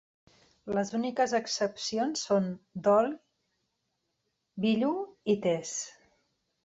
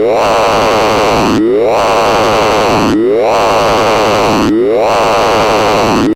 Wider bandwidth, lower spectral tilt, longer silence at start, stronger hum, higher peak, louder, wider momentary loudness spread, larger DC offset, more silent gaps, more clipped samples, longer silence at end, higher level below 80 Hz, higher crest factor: second, 8.2 kHz vs 16.5 kHz; about the same, -4.5 dB/octave vs -4.5 dB/octave; first, 0.65 s vs 0 s; neither; second, -14 dBFS vs -2 dBFS; second, -30 LUFS vs -9 LUFS; first, 11 LU vs 1 LU; neither; neither; neither; first, 0.75 s vs 0 s; second, -72 dBFS vs -32 dBFS; first, 18 dB vs 8 dB